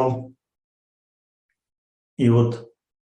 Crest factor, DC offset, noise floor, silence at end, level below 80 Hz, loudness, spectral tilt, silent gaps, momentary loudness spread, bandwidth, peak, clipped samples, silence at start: 20 dB; under 0.1%; under -90 dBFS; 0.5 s; -64 dBFS; -21 LUFS; -9 dB/octave; 0.64-1.49 s, 1.78-2.17 s; 18 LU; 8.8 kHz; -6 dBFS; under 0.1%; 0 s